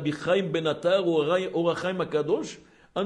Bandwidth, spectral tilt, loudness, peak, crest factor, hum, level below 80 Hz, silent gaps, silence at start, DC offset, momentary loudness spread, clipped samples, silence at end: 11.5 kHz; -6 dB/octave; -26 LUFS; -12 dBFS; 14 dB; none; -64 dBFS; none; 0 s; under 0.1%; 6 LU; under 0.1%; 0 s